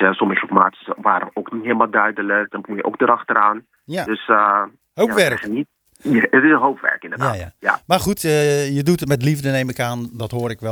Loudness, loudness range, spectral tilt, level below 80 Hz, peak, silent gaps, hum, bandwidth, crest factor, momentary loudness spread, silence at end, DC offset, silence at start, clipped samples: -18 LUFS; 2 LU; -5.5 dB/octave; -52 dBFS; 0 dBFS; none; none; over 20 kHz; 18 dB; 11 LU; 0 s; under 0.1%; 0 s; under 0.1%